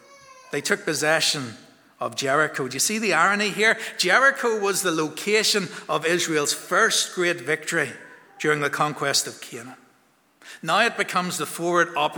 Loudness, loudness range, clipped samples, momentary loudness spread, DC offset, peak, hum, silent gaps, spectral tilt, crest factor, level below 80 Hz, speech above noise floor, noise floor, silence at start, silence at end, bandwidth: -22 LUFS; 5 LU; under 0.1%; 10 LU; under 0.1%; -4 dBFS; none; none; -2 dB/octave; 20 dB; -78 dBFS; 38 dB; -61 dBFS; 0.3 s; 0 s; over 20 kHz